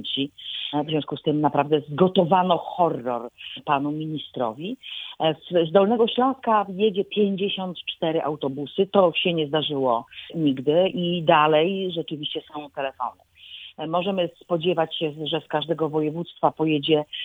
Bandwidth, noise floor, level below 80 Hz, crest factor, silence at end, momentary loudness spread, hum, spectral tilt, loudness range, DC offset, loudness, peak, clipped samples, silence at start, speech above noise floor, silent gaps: 19 kHz; -43 dBFS; -68 dBFS; 20 dB; 0 s; 12 LU; none; -8 dB/octave; 5 LU; under 0.1%; -23 LUFS; -4 dBFS; under 0.1%; 0 s; 20 dB; none